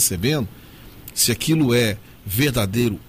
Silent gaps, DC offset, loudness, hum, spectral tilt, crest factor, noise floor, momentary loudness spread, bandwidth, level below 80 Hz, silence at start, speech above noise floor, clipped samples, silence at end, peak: none; under 0.1%; -20 LUFS; none; -4 dB/octave; 16 dB; -41 dBFS; 13 LU; 16 kHz; -44 dBFS; 0 s; 21 dB; under 0.1%; 0.05 s; -6 dBFS